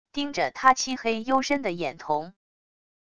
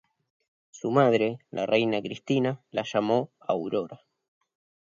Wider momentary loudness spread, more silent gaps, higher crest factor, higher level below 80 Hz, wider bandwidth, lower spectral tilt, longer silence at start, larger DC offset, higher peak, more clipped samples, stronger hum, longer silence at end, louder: about the same, 9 LU vs 10 LU; neither; about the same, 22 dB vs 20 dB; first, -62 dBFS vs -72 dBFS; first, 10.5 kHz vs 7.6 kHz; second, -3 dB/octave vs -6.5 dB/octave; second, 0.05 s vs 0.75 s; first, 0.4% vs under 0.1%; first, -4 dBFS vs -8 dBFS; neither; neither; second, 0.7 s vs 0.9 s; about the same, -25 LUFS vs -27 LUFS